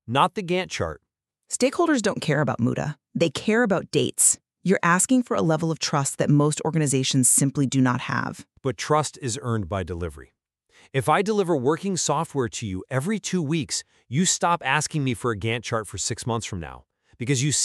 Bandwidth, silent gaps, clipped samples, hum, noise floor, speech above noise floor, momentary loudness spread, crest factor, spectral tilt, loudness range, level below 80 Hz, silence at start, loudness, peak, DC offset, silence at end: 13.5 kHz; none; under 0.1%; none; -60 dBFS; 36 dB; 11 LU; 20 dB; -4 dB/octave; 5 LU; -54 dBFS; 0.1 s; -23 LUFS; -4 dBFS; under 0.1%; 0 s